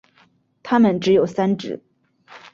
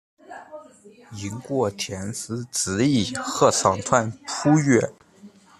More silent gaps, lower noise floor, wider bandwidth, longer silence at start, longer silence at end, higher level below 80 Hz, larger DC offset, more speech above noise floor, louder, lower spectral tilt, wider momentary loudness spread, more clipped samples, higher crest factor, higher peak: neither; first, -58 dBFS vs -49 dBFS; second, 7.2 kHz vs 14 kHz; first, 0.65 s vs 0.3 s; second, 0.15 s vs 0.3 s; about the same, -60 dBFS vs -60 dBFS; neither; first, 41 dB vs 27 dB; first, -18 LUFS vs -22 LUFS; first, -7 dB/octave vs -4.5 dB/octave; second, 17 LU vs 23 LU; neither; about the same, 16 dB vs 20 dB; about the same, -4 dBFS vs -2 dBFS